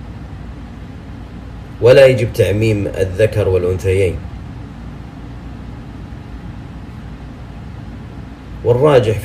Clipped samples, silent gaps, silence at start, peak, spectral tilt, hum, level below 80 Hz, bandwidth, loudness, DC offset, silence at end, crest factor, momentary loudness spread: under 0.1%; none; 0 s; 0 dBFS; -7 dB/octave; none; -34 dBFS; 15 kHz; -13 LUFS; under 0.1%; 0 s; 16 dB; 21 LU